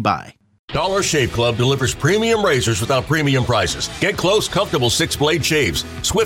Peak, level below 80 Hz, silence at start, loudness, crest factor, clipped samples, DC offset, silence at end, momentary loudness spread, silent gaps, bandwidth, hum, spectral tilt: -2 dBFS; -38 dBFS; 0 s; -17 LUFS; 16 dB; under 0.1%; under 0.1%; 0 s; 4 LU; 0.59-0.68 s; 17 kHz; none; -4 dB/octave